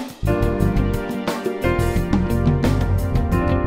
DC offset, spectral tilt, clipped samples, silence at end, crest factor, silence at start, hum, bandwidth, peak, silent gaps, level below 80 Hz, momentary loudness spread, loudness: under 0.1%; -7.5 dB/octave; under 0.1%; 0 s; 14 dB; 0 s; none; 16 kHz; -4 dBFS; none; -26 dBFS; 5 LU; -21 LUFS